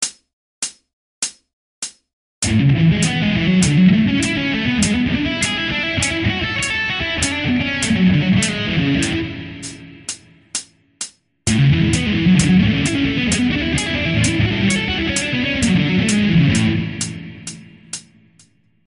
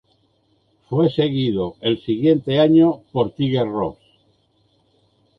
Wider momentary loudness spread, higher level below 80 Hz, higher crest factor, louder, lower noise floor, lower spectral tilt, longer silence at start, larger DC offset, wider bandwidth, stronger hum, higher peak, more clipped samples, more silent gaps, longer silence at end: first, 16 LU vs 9 LU; first, -36 dBFS vs -54 dBFS; about the same, 16 dB vs 16 dB; about the same, -17 LUFS vs -19 LUFS; second, -54 dBFS vs -63 dBFS; second, -4.5 dB/octave vs -9.5 dB/octave; second, 0 s vs 0.9 s; neither; first, 11 kHz vs 5.4 kHz; neither; about the same, -2 dBFS vs -4 dBFS; neither; first, 0.33-0.62 s, 0.93-1.22 s, 1.53-1.82 s, 2.13-2.42 s vs none; second, 0.85 s vs 1.45 s